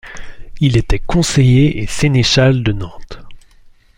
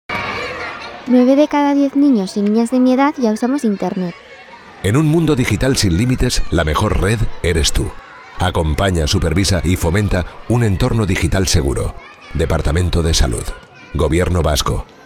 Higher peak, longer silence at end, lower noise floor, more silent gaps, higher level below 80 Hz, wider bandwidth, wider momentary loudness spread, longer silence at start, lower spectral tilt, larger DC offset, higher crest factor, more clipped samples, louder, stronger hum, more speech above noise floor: about the same, -2 dBFS vs 0 dBFS; first, 0.6 s vs 0.2 s; first, -44 dBFS vs -38 dBFS; neither; about the same, -28 dBFS vs -26 dBFS; second, 12 kHz vs 16.5 kHz; first, 15 LU vs 11 LU; about the same, 0.05 s vs 0.1 s; about the same, -5.5 dB/octave vs -5.5 dB/octave; neither; about the same, 12 dB vs 16 dB; neither; first, -13 LUFS vs -16 LUFS; neither; first, 32 dB vs 23 dB